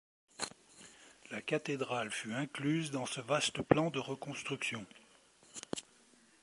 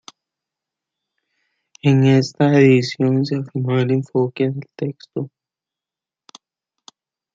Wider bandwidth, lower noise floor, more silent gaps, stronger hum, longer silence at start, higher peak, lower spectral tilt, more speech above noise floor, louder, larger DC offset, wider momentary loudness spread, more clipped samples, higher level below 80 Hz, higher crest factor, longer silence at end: first, 11.5 kHz vs 7.6 kHz; second, -66 dBFS vs -89 dBFS; neither; neither; second, 0.4 s vs 1.85 s; second, -10 dBFS vs -2 dBFS; second, -4 dB/octave vs -7.5 dB/octave; second, 29 dB vs 72 dB; second, -37 LUFS vs -18 LUFS; neither; first, 22 LU vs 15 LU; neither; second, -70 dBFS vs -64 dBFS; first, 28 dB vs 18 dB; second, 0.6 s vs 2.1 s